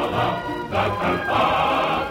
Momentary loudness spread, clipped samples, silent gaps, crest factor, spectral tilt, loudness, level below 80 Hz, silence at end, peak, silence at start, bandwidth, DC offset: 5 LU; under 0.1%; none; 14 dB; -6 dB/octave; -21 LUFS; -44 dBFS; 0 s; -8 dBFS; 0 s; 16.5 kHz; under 0.1%